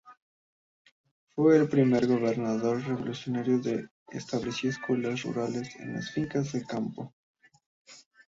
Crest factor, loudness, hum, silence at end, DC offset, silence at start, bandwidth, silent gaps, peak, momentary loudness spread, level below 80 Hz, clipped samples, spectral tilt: 20 dB; -29 LUFS; none; 0.3 s; under 0.1%; 0.05 s; 7.8 kHz; 0.17-0.85 s, 0.91-1.04 s, 1.11-1.27 s, 3.91-4.06 s, 7.13-7.34 s, 7.66-7.85 s; -10 dBFS; 14 LU; -66 dBFS; under 0.1%; -6.5 dB/octave